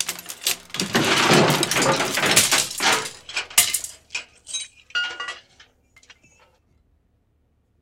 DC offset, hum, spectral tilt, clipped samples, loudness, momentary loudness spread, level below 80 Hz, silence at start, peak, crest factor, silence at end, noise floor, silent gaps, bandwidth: under 0.1%; none; -2 dB/octave; under 0.1%; -20 LUFS; 16 LU; -58 dBFS; 0 s; 0 dBFS; 24 dB; 2.4 s; -65 dBFS; none; 17 kHz